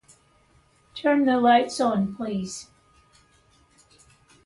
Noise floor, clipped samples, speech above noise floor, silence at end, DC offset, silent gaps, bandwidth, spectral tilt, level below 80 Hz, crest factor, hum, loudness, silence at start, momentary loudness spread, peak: -61 dBFS; under 0.1%; 39 dB; 1.8 s; under 0.1%; none; 11.5 kHz; -5 dB/octave; -62 dBFS; 18 dB; none; -23 LUFS; 0.95 s; 17 LU; -8 dBFS